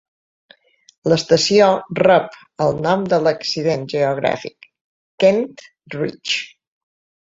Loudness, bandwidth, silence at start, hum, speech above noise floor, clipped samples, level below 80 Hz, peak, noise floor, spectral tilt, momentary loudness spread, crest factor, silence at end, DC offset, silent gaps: -17 LUFS; 7.8 kHz; 1.05 s; none; 34 dB; under 0.1%; -56 dBFS; -2 dBFS; -51 dBFS; -4.5 dB/octave; 13 LU; 18 dB; 0.85 s; under 0.1%; 4.81-5.18 s